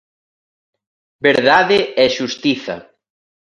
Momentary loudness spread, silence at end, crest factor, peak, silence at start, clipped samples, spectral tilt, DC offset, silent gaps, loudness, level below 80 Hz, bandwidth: 12 LU; 0.6 s; 18 dB; 0 dBFS; 1.2 s; under 0.1%; -4 dB/octave; under 0.1%; none; -15 LUFS; -56 dBFS; 11 kHz